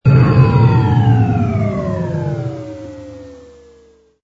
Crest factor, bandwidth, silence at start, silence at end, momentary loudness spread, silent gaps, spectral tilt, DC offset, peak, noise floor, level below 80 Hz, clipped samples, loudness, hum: 14 dB; 6.6 kHz; 0.05 s; 0.85 s; 21 LU; none; -9.5 dB/octave; under 0.1%; 0 dBFS; -49 dBFS; -36 dBFS; under 0.1%; -14 LUFS; none